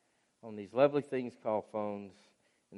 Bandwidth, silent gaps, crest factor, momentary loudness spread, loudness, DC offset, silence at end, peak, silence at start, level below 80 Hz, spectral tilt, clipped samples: 10.5 kHz; none; 22 dB; 20 LU; -34 LUFS; under 0.1%; 0 s; -14 dBFS; 0.45 s; -84 dBFS; -7.5 dB/octave; under 0.1%